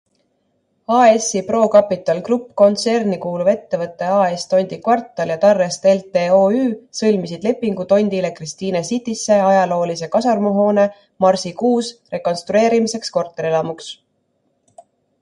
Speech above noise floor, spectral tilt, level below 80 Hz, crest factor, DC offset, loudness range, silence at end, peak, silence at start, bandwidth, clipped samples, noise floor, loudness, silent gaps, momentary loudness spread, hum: 50 dB; -5 dB/octave; -62 dBFS; 16 dB; under 0.1%; 3 LU; 1.25 s; 0 dBFS; 0.9 s; 11.5 kHz; under 0.1%; -66 dBFS; -17 LUFS; none; 9 LU; none